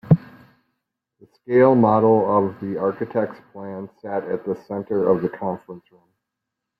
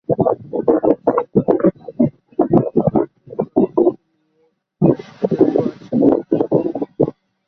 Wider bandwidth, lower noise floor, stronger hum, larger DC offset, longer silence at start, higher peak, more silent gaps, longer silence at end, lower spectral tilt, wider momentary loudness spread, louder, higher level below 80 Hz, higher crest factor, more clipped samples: second, 5 kHz vs 6 kHz; first, -82 dBFS vs -63 dBFS; neither; neither; about the same, 0.05 s vs 0.1 s; about the same, -2 dBFS vs -2 dBFS; neither; first, 1 s vs 0.4 s; about the same, -11.5 dB/octave vs -11.5 dB/octave; first, 18 LU vs 6 LU; second, -20 LUFS vs -17 LUFS; second, -60 dBFS vs -52 dBFS; about the same, 20 dB vs 16 dB; neither